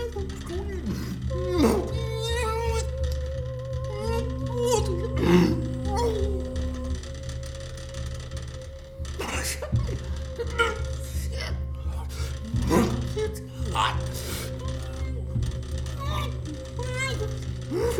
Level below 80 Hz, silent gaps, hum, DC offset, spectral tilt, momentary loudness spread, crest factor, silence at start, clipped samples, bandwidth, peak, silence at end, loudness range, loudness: -34 dBFS; none; none; under 0.1%; -5.5 dB/octave; 12 LU; 20 dB; 0 s; under 0.1%; 18.5 kHz; -6 dBFS; 0 s; 6 LU; -29 LUFS